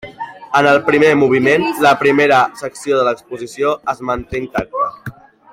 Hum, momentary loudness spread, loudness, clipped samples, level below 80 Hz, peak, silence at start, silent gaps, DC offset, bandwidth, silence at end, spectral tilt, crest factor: none; 14 LU; -14 LUFS; under 0.1%; -46 dBFS; -2 dBFS; 0.05 s; none; under 0.1%; 16 kHz; 0.4 s; -5 dB/octave; 14 dB